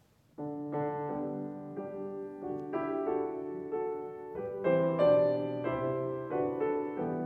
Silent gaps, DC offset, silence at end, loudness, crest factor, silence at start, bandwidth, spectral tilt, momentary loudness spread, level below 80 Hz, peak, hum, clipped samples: none; under 0.1%; 0 s; -33 LUFS; 18 dB; 0.4 s; 4.5 kHz; -9.5 dB/octave; 14 LU; -68 dBFS; -16 dBFS; none; under 0.1%